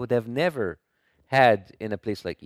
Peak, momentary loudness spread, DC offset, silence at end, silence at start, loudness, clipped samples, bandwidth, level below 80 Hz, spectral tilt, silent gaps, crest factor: -4 dBFS; 13 LU; under 0.1%; 0 s; 0 s; -25 LUFS; under 0.1%; 15.5 kHz; -60 dBFS; -6.5 dB/octave; none; 22 dB